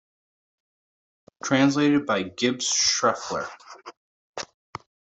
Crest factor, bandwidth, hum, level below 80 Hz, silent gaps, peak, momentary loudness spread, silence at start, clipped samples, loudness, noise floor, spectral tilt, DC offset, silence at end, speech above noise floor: 22 dB; 8.2 kHz; none; -68 dBFS; 3.97-4.33 s; -6 dBFS; 23 LU; 1.45 s; under 0.1%; -22 LUFS; under -90 dBFS; -3 dB/octave; under 0.1%; 0.75 s; over 67 dB